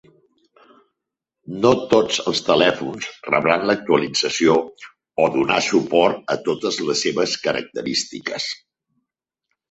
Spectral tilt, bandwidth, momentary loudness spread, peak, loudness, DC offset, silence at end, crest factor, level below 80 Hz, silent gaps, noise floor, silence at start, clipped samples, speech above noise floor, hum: -3.5 dB/octave; 8.2 kHz; 10 LU; 0 dBFS; -19 LUFS; under 0.1%; 1.15 s; 20 dB; -58 dBFS; none; -83 dBFS; 1.5 s; under 0.1%; 64 dB; none